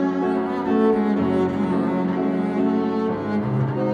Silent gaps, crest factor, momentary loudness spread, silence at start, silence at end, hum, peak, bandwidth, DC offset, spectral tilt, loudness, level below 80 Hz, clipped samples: none; 14 dB; 4 LU; 0 s; 0 s; none; -6 dBFS; 7.2 kHz; under 0.1%; -9 dB/octave; -22 LUFS; -56 dBFS; under 0.1%